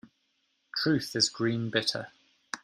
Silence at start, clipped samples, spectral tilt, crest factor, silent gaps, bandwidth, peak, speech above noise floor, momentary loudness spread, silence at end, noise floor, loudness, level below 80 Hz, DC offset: 0.05 s; under 0.1%; -3.5 dB/octave; 22 dB; none; 15.5 kHz; -10 dBFS; 46 dB; 13 LU; 0.05 s; -75 dBFS; -29 LUFS; -70 dBFS; under 0.1%